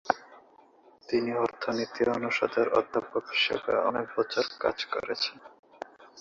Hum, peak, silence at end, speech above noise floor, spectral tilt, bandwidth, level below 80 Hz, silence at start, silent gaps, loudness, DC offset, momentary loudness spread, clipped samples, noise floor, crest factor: none; -4 dBFS; 0 s; 29 dB; -4 dB/octave; 7.6 kHz; -68 dBFS; 0.05 s; 5.59-5.63 s; -29 LUFS; under 0.1%; 6 LU; under 0.1%; -58 dBFS; 26 dB